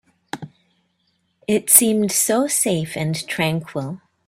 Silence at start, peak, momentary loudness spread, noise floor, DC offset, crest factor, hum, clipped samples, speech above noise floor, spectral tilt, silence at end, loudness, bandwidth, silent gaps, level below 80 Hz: 0.35 s; 0 dBFS; 22 LU; -68 dBFS; under 0.1%; 22 dB; none; under 0.1%; 49 dB; -3.5 dB/octave; 0.3 s; -17 LUFS; 16 kHz; none; -60 dBFS